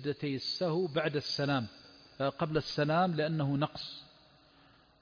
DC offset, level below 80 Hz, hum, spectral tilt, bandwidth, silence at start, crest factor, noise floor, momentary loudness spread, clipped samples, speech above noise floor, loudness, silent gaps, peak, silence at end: under 0.1%; -64 dBFS; none; -4.5 dB/octave; 5.4 kHz; 0 s; 16 dB; -63 dBFS; 13 LU; under 0.1%; 30 dB; -33 LUFS; none; -18 dBFS; 0.95 s